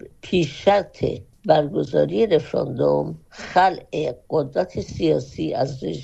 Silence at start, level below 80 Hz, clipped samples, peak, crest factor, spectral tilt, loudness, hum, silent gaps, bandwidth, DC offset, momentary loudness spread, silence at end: 0.05 s; -48 dBFS; under 0.1%; -2 dBFS; 20 dB; -6.5 dB/octave; -22 LUFS; none; none; 8.2 kHz; under 0.1%; 8 LU; 0 s